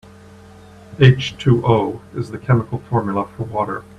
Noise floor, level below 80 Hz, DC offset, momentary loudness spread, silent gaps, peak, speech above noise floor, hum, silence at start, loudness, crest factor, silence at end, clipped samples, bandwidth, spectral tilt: -42 dBFS; -46 dBFS; under 0.1%; 14 LU; none; 0 dBFS; 25 dB; none; 0.9 s; -18 LUFS; 18 dB; 0.15 s; under 0.1%; 7.6 kHz; -7.5 dB/octave